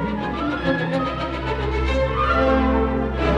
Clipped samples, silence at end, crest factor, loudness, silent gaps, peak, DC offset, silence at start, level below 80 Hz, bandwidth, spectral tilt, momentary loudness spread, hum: under 0.1%; 0 s; 14 dB; -21 LUFS; none; -6 dBFS; under 0.1%; 0 s; -28 dBFS; 7.8 kHz; -7.5 dB/octave; 7 LU; none